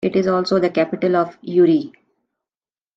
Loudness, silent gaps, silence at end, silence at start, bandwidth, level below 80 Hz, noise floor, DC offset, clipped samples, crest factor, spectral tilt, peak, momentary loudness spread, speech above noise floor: -18 LUFS; none; 1.1 s; 0 s; 7.6 kHz; -64 dBFS; under -90 dBFS; under 0.1%; under 0.1%; 14 dB; -7.5 dB/octave; -4 dBFS; 5 LU; over 73 dB